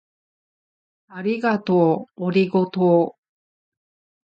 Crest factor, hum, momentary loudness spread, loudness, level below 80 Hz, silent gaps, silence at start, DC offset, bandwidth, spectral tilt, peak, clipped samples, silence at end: 18 dB; none; 9 LU; -20 LUFS; -70 dBFS; none; 1.1 s; under 0.1%; 5.8 kHz; -9 dB/octave; -4 dBFS; under 0.1%; 1.15 s